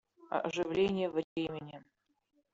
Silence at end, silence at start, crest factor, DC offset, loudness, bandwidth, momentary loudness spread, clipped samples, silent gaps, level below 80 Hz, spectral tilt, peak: 0.7 s; 0.2 s; 18 dB; under 0.1%; -35 LUFS; 7.8 kHz; 16 LU; under 0.1%; 1.24-1.36 s; -68 dBFS; -4.5 dB/octave; -18 dBFS